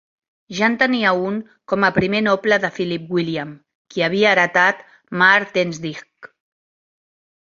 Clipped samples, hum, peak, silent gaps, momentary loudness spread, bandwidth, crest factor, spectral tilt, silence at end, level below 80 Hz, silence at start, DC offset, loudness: under 0.1%; none; 0 dBFS; 3.75-3.85 s; 16 LU; 7.6 kHz; 20 dB; -5 dB/octave; 1.2 s; -56 dBFS; 0.5 s; under 0.1%; -17 LUFS